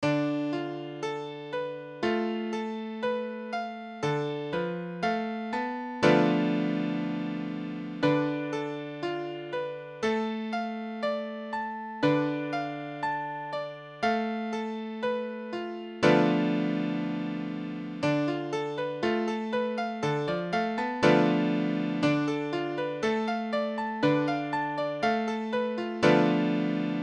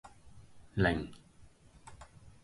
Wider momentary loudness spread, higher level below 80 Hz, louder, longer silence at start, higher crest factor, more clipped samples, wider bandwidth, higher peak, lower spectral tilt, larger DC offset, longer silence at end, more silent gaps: second, 11 LU vs 26 LU; second, -68 dBFS vs -52 dBFS; first, -29 LUFS vs -34 LUFS; about the same, 0 s vs 0.05 s; about the same, 20 dB vs 24 dB; neither; second, 9.4 kHz vs 11.5 kHz; first, -8 dBFS vs -14 dBFS; about the same, -6.5 dB/octave vs -7 dB/octave; neither; second, 0 s vs 0.15 s; neither